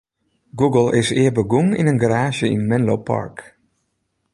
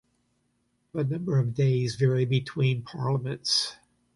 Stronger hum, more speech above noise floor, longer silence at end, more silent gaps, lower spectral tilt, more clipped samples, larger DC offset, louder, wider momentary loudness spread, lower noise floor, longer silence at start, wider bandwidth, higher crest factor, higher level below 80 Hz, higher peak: neither; first, 54 dB vs 47 dB; first, 0.9 s vs 0.45 s; neither; about the same, -6.5 dB/octave vs -5.5 dB/octave; neither; neither; first, -18 LUFS vs -27 LUFS; about the same, 8 LU vs 6 LU; about the same, -71 dBFS vs -73 dBFS; second, 0.55 s vs 0.95 s; about the same, 11.5 kHz vs 11.5 kHz; about the same, 16 dB vs 16 dB; first, -52 dBFS vs -62 dBFS; first, -2 dBFS vs -12 dBFS